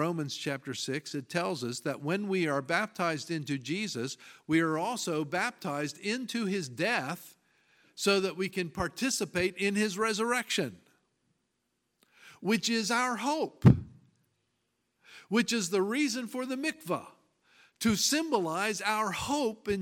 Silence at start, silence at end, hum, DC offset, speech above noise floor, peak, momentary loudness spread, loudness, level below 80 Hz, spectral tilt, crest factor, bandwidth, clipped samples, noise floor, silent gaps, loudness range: 0 s; 0 s; none; under 0.1%; 49 dB; -6 dBFS; 7 LU; -31 LUFS; -58 dBFS; -4.5 dB/octave; 26 dB; 17 kHz; under 0.1%; -80 dBFS; none; 3 LU